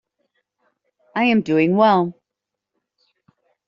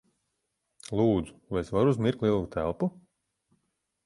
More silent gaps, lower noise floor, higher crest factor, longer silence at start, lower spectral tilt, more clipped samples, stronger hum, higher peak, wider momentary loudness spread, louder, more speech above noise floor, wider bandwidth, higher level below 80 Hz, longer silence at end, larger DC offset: neither; about the same, -83 dBFS vs -80 dBFS; about the same, 20 dB vs 18 dB; first, 1.15 s vs 0.9 s; second, -5 dB/octave vs -8 dB/octave; neither; neither; first, -2 dBFS vs -12 dBFS; about the same, 11 LU vs 9 LU; first, -18 LUFS vs -28 LUFS; first, 67 dB vs 53 dB; second, 7.2 kHz vs 11.5 kHz; second, -66 dBFS vs -52 dBFS; first, 1.55 s vs 1.15 s; neither